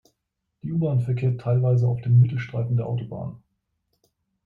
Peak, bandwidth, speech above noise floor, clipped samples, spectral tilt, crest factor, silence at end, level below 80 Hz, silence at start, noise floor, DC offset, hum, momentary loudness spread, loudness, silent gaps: -8 dBFS; 4.2 kHz; 57 dB; under 0.1%; -10.5 dB/octave; 16 dB; 1.1 s; -58 dBFS; 0.65 s; -79 dBFS; under 0.1%; none; 15 LU; -23 LUFS; none